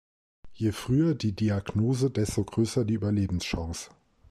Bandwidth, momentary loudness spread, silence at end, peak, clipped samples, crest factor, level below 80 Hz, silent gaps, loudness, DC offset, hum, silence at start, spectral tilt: 14.5 kHz; 7 LU; 0.4 s; -14 dBFS; under 0.1%; 14 dB; -48 dBFS; none; -28 LUFS; under 0.1%; none; 0.45 s; -6.5 dB/octave